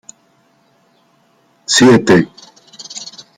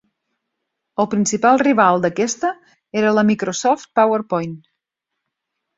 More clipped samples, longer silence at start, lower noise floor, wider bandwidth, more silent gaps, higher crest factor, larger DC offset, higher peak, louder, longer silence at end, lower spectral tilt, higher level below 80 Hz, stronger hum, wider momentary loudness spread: neither; first, 1.7 s vs 1 s; second, -55 dBFS vs -80 dBFS; first, 15 kHz vs 7.8 kHz; neither; about the same, 16 dB vs 18 dB; neither; about the same, 0 dBFS vs -2 dBFS; first, -10 LUFS vs -17 LUFS; second, 0.3 s vs 1.2 s; about the same, -4 dB/octave vs -4.5 dB/octave; first, -52 dBFS vs -62 dBFS; neither; first, 22 LU vs 11 LU